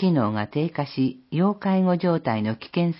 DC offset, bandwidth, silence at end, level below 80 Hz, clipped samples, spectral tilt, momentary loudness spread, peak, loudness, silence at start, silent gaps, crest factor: under 0.1%; 5.8 kHz; 0 s; -62 dBFS; under 0.1%; -12 dB/octave; 5 LU; -8 dBFS; -24 LUFS; 0 s; none; 14 dB